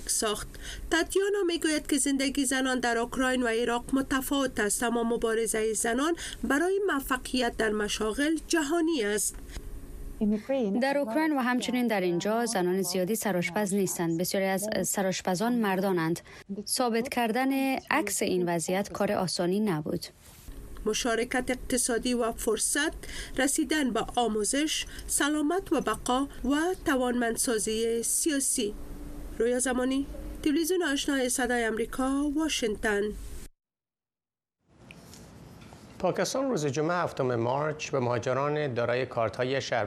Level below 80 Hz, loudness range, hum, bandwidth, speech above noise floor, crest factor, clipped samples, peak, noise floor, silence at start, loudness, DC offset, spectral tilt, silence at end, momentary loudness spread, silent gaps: -48 dBFS; 3 LU; none; 14.5 kHz; over 62 dB; 18 dB; under 0.1%; -10 dBFS; under -90 dBFS; 0 s; -28 LUFS; under 0.1%; -3.5 dB/octave; 0 s; 6 LU; none